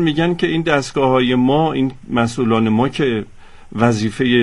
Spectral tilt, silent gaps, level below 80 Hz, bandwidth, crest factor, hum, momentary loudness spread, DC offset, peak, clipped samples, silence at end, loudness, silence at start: -6 dB/octave; none; -42 dBFS; 11.5 kHz; 14 dB; none; 5 LU; under 0.1%; -2 dBFS; under 0.1%; 0 s; -17 LUFS; 0 s